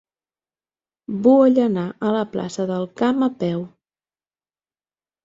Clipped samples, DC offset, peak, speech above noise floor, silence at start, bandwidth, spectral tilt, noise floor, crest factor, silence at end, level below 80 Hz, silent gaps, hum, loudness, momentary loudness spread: under 0.1%; under 0.1%; -4 dBFS; over 71 dB; 1.1 s; 7.6 kHz; -7.5 dB/octave; under -90 dBFS; 18 dB; 1.55 s; -64 dBFS; none; none; -20 LUFS; 13 LU